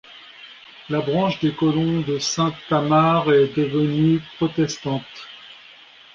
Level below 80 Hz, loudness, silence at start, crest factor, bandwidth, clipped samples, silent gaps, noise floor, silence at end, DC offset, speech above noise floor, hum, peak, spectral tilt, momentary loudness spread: -54 dBFS; -20 LUFS; 0.1 s; 16 dB; 7.6 kHz; under 0.1%; none; -46 dBFS; 0.6 s; under 0.1%; 27 dB; none; -4 dBFS; -6 dB/octave; 23 LU